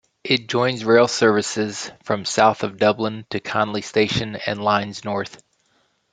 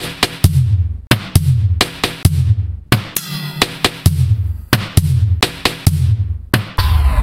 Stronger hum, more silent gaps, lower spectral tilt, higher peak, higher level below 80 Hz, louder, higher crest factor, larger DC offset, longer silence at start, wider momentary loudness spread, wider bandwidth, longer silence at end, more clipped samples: neither; second, none vs 1.07-1.11 s; about the same, -4 dB/octave vs -4.5 dB/octave; about the same, -2 dBFS vs 0 dBFS; second, -58 dBFS vs -22 dBFS; second, -20 LUFS vs -16 LUFS; first, 20 dB vs 14 dB; neither; first, 0.25 s vs 0 s; first, 10 LU vs 4 LU; second, 9.4 kHz vs 17.5 kHz; first, 0.85 s vs 0 s; second, under 0.1% vs 0.3%